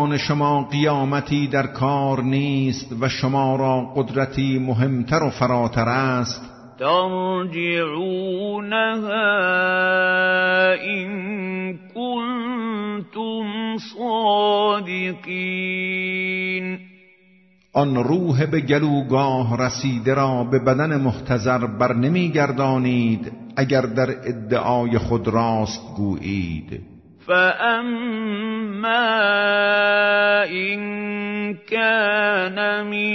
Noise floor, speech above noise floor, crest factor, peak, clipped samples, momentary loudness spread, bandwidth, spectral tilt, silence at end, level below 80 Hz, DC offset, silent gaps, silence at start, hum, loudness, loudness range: -55 dBFS; 35 dB; 16 dB; -4 dBFS; under 0.1%; 9 LU; 6.4 kHz; -6 dB/octave; 0 s; -52 dBFS; under 0.1%; none; 0 s; none; -20 LUFS; 4 LU